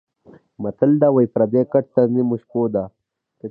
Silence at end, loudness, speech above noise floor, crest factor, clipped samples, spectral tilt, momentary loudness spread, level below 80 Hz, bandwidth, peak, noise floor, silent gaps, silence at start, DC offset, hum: 0 s; -18 LUFS; 32 dB; 16 dB; under 0.1%; -13 dB/octave; 14 LU; -60 dBFS; 4.3 kHz; -2 dBFS; -50 dBFS; none; 0.6 s; under 0.1%; none